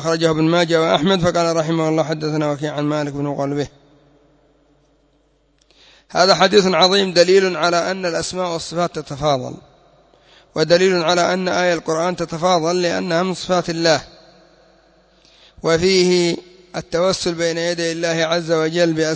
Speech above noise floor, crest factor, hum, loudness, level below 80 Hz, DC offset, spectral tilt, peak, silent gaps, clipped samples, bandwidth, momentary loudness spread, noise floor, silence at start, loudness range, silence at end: 42 dB; 18 dB; none; -17 LUFS; -52 dBFS; under 0.1%; -4.5 dB/octave; 0 dBFS; none; under 0.1%; 8 kHz; 9 LU; -59 dBFS; 0 s; 7 LU; 0 s